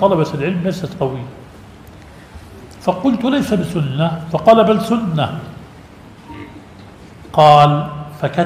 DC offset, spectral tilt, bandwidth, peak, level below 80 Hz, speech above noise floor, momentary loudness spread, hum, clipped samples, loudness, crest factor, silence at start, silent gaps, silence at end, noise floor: under 0.1%; -7 dB/octave; 15.5 kHz; 0 dBFS; -46 dBFS; 25 dB; 24 LU; none; under 0.1%; -15 LUFS; 16 dB; 0 s; none; 0 s; -39 dBFS